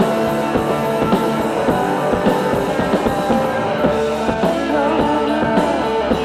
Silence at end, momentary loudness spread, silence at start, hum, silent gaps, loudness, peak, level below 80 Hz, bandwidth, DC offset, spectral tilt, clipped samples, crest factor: 0 s; 2 LU; 0 s; none; none; -17 LUFS; -4 dBFS; -38 dBFS; 16 kHz; under 0.1%; -6 dB/octave; under 0.1%; 14 dB